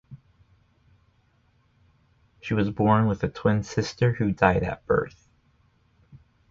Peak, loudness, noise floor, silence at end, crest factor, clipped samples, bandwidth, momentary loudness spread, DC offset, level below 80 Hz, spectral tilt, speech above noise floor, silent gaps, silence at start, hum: -2 dBFS; -24 LUFS; -64 dBFS; 0.35 s; 24 dB; under 0.1%; 7.6 kHz; 8 LU; under 0.1%; -48 dBFS; -7 dB/octave; 41 dB; none; 0.1 s; none